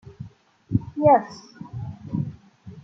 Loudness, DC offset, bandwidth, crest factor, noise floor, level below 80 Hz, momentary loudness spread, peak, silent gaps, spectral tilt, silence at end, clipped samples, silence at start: -23 LUFS; under 0.1%; 7.6 kHz; 22 dB; -45 dBFS; -52 dBFS; 24 LU; -4 dBFS; none; -9 dB/octave; 0.05 s; under 0.1%; 0.05 s